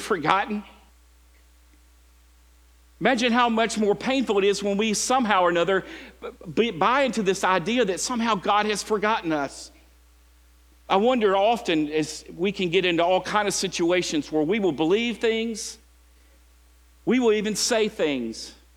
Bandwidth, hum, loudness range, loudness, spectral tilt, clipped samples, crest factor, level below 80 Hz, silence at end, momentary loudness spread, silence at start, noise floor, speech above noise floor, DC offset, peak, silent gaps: 18 kHz; none; 4 LU; -23 LUFS; -3.5 dB/octave; under 0.1%; 24 dB; -54 dBFS; 0.25 s; 10 LU; 0 s; -55 dBFS; 32 dB; under 0.1%; 0 dBFS; none